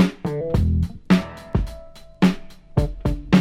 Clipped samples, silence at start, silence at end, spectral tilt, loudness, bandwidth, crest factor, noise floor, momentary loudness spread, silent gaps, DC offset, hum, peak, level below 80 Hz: under 0.1%; 0 s; 0 s; -7.5 dB/octave; -22 LUFS; 13 kHz; 18 dB; -40 dBFS; 8 LU; none; under 0.1%; none; -2 dBFS; -30 dBFS